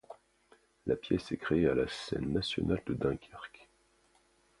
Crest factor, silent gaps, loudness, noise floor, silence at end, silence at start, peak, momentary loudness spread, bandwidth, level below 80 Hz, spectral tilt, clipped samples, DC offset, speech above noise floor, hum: 20 dB; none; -33 LUFS; -69 dBFS; 0.95 s; 0.1 s; -16 dBFS; 19 LU; 11.5 kHz; -54 dBFS; -6.5 dB/octave; under 0.1%; under 0.1%; 37 dB; none